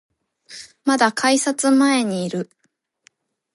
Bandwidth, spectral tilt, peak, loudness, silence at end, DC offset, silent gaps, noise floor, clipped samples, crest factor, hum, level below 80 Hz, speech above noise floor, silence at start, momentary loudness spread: 11.5 kHz; -3.5 dB/octave; -4 dBFS; -18 LUFS; 1.1 s; under 0.1%; none; -69 dBFS; under 0.1%; 16 dB; none; -72 dBFS; 52 dB; 0.5 s; 21 LU